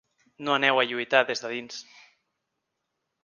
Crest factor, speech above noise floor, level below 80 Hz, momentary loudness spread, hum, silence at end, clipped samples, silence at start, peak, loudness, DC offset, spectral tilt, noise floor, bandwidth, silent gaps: 26 dB; 55 dB; -78 dBFS; 16 LU; none; 1.4 s; under 0.1%; 0.4 s; -4 dBFS; -25 LUFS; under 0.1%; -3 dB/octave; -81 dBFS; 9.8 kHz; none